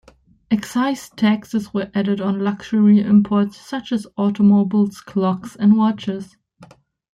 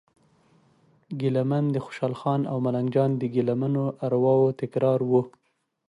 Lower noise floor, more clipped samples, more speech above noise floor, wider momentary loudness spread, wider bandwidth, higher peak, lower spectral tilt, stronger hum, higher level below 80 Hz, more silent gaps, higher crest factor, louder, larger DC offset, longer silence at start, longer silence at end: second, -48 dBFS vs -62 dBFS; neither; second, 30 dB vs 38 dB; first, 10 LU vs 7 LU; about the same, 11 kHz vs 10.5 kHz; first, -4 dBFS vs -10 dBFS; second, -7.5 dB/octave vs -9.5 dB/octave; neither; first, -58 dBFS vs -70 dBFS; neither; about the same, 14 dB vs 16 dB; first, -18 LUFS vs -25 LUFS; neither; second, 0.5 s vs 1.1 s; about the same, 0.5 s vs 0.6 s